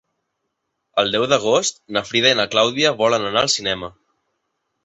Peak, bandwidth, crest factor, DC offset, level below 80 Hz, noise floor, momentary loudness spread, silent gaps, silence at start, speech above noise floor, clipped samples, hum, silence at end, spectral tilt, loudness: -2 dBFS; 8.2 kHz; 18 dB; under 0.1%; -58 dBFS; -75 dBFS; 9 LU; none; 0.95 s; 57 dB; under 0.1%; none; 0.95 s; -2.5 dB/octave; -18 LUFS